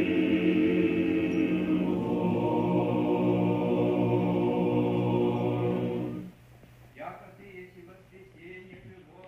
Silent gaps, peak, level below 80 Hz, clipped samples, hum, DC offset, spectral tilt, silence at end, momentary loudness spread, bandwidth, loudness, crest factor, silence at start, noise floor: none; -14 dBFS; -58 dBFS; under 0.1%; none; under 0.1%; -9 dB/octave; 0 s; 21 LU; 6 kHz; -27 LUFS; 14 dB; 0 s; -53 dBFS